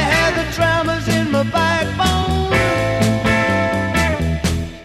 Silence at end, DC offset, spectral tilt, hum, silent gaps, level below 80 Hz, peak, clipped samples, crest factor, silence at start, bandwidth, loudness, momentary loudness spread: 0 s; 0.2%; -5 dB/octave; none; none; -30 dBFS; -4 dBFS; under 0.1%; 14 dB; 0 s; 15.5 kHz; -17 LUFS; 3 LU